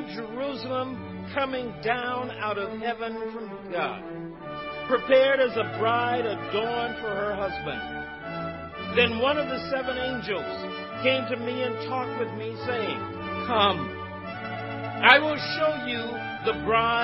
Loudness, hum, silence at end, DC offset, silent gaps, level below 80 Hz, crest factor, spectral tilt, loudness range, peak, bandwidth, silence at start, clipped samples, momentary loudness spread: -27 LUFS; none; 0 s; under 0.1%; none; -54 dBFS; 26 dB; -7.5 dB/octave; 6 LU; 0 dBFS; 5.8 kHz; 0 s; under 0.1%; 13 LU